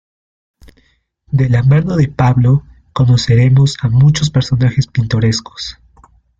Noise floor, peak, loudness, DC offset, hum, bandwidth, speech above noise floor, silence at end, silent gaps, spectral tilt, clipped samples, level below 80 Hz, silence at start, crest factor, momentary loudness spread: -56 dBFS; -2 dBFS; -13 LUFS; under 0.1%; none; 7.8 kHz; 45 dB; 0.7 s; none; -6.5 dB/octave; under 0.1%; -38 dBFS; 1.3 s; 12 dB; 9 LU